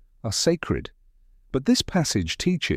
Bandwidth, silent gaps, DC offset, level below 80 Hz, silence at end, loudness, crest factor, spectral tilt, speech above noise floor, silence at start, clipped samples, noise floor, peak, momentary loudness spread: 16 kHz; none; under 0.1%; -44 dBFS; 0 s; -24 LUFS; 16 dB; -4.5 dB/octave; 32 dB; 0.25 s; under 0.1%; -56 dBFS; -8 dBFS; 8 LU